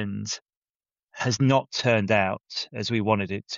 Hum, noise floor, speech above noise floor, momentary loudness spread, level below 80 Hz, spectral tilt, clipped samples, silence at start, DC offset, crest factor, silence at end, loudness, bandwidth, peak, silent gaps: none; under -90 dBFS; over 65 dB; 11 LU; -62 dBFS; -4.5 dB/octave; under 0.1%; 0 s; under 0.1%; 18 dB; 0 s; -25 LUFS; 7.6 kHz; -8 dBFS; 0.42-0.46 s, 0.57-0.62 s, 0.69-0.80 s, 1.03-1.07 s